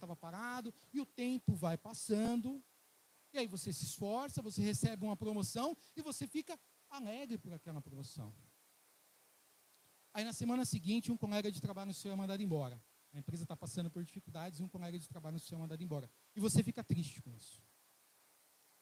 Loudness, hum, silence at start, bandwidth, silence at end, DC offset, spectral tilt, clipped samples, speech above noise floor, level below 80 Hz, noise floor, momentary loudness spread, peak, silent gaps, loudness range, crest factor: -42 LUFS; none; 0 s; 16.5 kHz; 1.2 s; under 0.1%; -5.5 dB/octave; under 0.1%; 30 dB; -74 dBFS; -71 dBFS; 13 LU; -18 dBFS; none; 7 LU; 24 dB